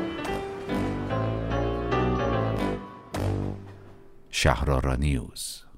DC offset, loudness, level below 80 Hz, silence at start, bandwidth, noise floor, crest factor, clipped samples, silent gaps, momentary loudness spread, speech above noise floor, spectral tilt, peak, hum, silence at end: under 0.1%; -28 LUFS; -36 dBFS; 0 s; 16 kHz; -47 dBFS; 20 dB; under 0.1%; none; 10 LU; 22 dB; -5.5 dB/octave; -6 dBFS; none; 0 s